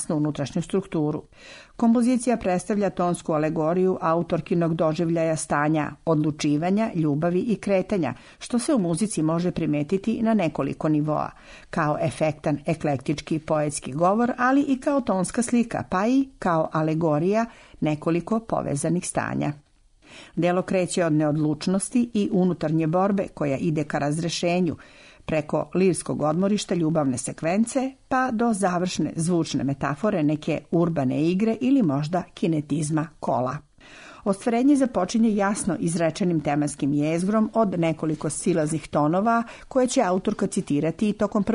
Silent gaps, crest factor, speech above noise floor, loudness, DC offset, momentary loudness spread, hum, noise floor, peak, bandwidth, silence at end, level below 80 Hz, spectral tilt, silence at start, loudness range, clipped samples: none; 14 dB; 23 dB; -24 LUFS; under 0.1%; 5 LU; none; -46 dBFS; -8 dBFS; 11 kHz; 0 s; -54 dBFS; -6 dB/octave; 0 s; 2 LU; under 0.1%